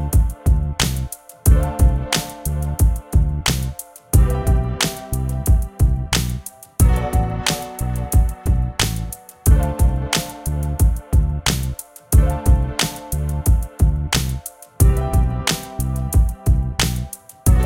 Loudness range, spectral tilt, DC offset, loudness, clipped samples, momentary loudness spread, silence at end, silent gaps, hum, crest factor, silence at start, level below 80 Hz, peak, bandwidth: 1 LU; -4.5 dB/octave; under 0.1%; -20 LUFS; under 0.1%; 8 LU; 0 s; none; none; 16 dB; 0 s; -20 dBFS; -2 dBFS; 17 kHz